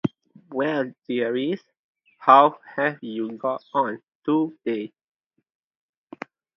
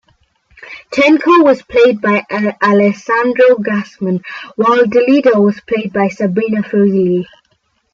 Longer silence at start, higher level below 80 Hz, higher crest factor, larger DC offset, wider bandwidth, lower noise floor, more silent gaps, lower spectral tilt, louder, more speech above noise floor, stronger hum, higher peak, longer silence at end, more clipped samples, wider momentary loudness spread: second, 0.05 s vs 0.6 s; second, -74 dBFS vs -54 dBFS; first, 24 dB vs 12 dB; neither; second, 6.2 kHz vs 7.4 kHz; second, -42 dBFS vs -60 dBFS; first, 1.79-1.95 s, 4.15-4.20 s vs none; about the same, -8 dB/octave vs -7 dB/octave; second, -23 LUFS vs -12 LUFS; second, 19 dB vs 49 dB; neither; about the same, 0 dBFS vs 0 dBFS; first, 1.7 s vs 0.7 s; neither; first, 18 LU vs 10 LU